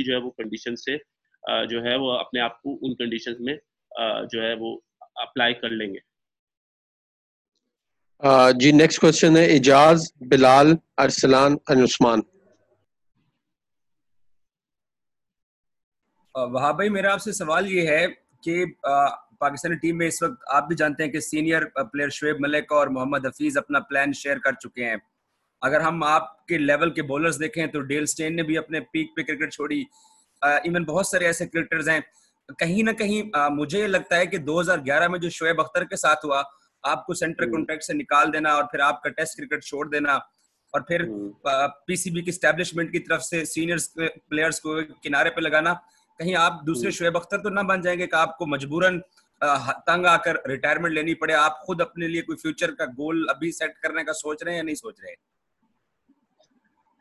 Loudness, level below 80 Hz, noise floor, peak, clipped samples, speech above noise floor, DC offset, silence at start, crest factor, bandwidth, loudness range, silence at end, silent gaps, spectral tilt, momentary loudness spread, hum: -22 LUFS; -62 dBFS; -89 dBFS; -2 dBFS; under 0.1%; 67 dB; under 0.1%; 0 s; 20 dB; 12.5 kHz; 11 LU; 1.85 s; 6.39-6.47 s, 6.57-7.52 s, 15.43-15.64 s, 15.84-15.92 s; -4.5 dB/octave; 12 LU; none